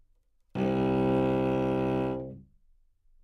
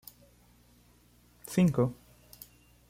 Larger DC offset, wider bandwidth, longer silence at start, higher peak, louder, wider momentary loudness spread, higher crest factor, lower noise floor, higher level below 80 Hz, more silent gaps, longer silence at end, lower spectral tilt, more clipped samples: neither; second, 9.8 kHz vs 16 kHz; second, 0.55 s vs 1.45 s; about the same, -16 dBFS vs -14 dBFS; about the same, -28 LUFS vs -29 LUFS; second, 12 LU vs 26 LU; second, 14 dB vs 20 dB; first, -66 dBFS vs -62 dBFS; first, -50 dBFS vs -62 dBFS; neither; second, 0.8 s vs 0.95 s; first, -9 dB/octave vs -7.5 dB/octave; neither